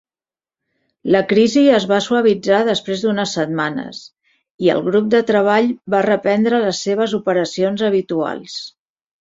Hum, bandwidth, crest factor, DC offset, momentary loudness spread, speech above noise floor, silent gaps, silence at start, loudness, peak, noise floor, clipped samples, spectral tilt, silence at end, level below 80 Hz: none; 7.8 kHz; 16 dB; under 0.1%; 12 LU; over 74 dB; 4.51-4.59 s; 1.05 s; -16 LUFS; -2 dBFS; under -90 dBFS; under 0.1%; -5 dB/octave; 0.5 s; -60 dBFS